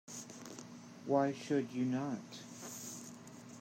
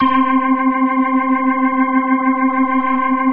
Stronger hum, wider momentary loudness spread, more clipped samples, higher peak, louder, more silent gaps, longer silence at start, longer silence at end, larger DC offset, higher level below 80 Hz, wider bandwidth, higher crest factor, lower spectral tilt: neither; first, 17 LU vs 1 LU; neither; second, -18 dBFS vs -2 dBFS; second, -39 LUFS vs -15 LUFS; neither; about the same, 0.05 s vs 0 s; about the same, 0 s vs 0 s; neither; second, -86 dBFS vs -54 dBFS; first, 16 kHz vs 3.4 kHz; first, 22 dB vs 12 dB; second, -5.5 dB/octave vs -8.5 dB/octave